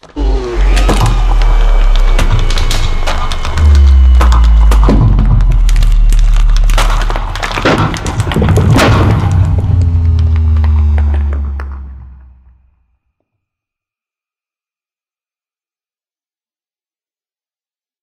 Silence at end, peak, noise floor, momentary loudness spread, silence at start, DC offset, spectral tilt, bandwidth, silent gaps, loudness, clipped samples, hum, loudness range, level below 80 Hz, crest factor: 5.9 s; 0 dBFS; under -90 dBFS; 9 LU; 0.15 s; under 0.1%; -6 dB/octave; 12.5 kHz; none; -11 LUFS; under 0.1%; none; 6 LU; -10 dBFS; 10 dB